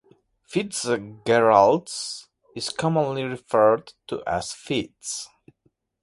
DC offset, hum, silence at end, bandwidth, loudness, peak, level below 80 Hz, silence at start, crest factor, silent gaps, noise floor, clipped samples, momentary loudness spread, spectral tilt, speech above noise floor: under 0.1%; none; 0.75 s; 11.5 kHz; -23 LUFS; -2 dBFS; -58 dBFS; 0.5 s; 22 dB; none; -69 dBFS; under 0.1%; 16 LU; -4.5 dB/octave; 46 dB